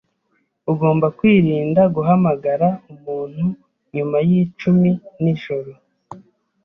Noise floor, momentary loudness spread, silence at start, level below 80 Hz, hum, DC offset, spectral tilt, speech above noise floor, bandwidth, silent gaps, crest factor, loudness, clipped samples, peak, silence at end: -67 dBFS; 14 LU; 0.65 s; -56 dBFS; none; under 0.1%; -10.5 dB/octave; 50 dB; 5.6 kHz; none; 14 dB; -18 LUFS; under 0.1%; -4 dBFS; 0.45 s